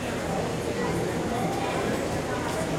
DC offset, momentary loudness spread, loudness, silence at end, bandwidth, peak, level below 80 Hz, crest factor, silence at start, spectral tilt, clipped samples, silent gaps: under 0.1%; 1 LU; -28 LUFS; 0 s; 16.5 kHz; -14 dBFS; -48 dBFS; 14 dB; 0 s; -5 dB/octave; under 0.1%; none